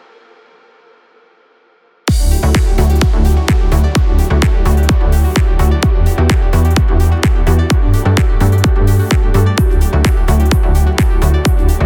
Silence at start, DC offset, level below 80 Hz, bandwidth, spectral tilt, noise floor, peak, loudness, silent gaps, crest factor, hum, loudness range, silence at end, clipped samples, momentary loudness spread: 2.05 s; under 0.1%; -12 dBFS; 18.5 kHz; -6 dB/octave; -51 dBFS; 0 dBFS; -13 LUFS; none; 10 dB; none; 2 LU; 0 s; under 0.1%; 1 LU